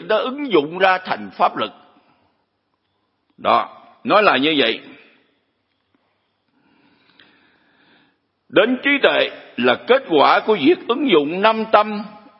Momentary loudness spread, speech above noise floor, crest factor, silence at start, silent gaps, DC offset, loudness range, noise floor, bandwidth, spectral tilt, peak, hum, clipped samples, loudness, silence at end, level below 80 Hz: 11 LU; 53 dB; 20 dB; 0 s; none; under 0.1%; 8 LU; -70 dBFS; 5.8 kHz; -7.5 dB/octave; 0 dBFS; none; under 0.1%; -17 LUFS; 0.3 s; -72 dBFS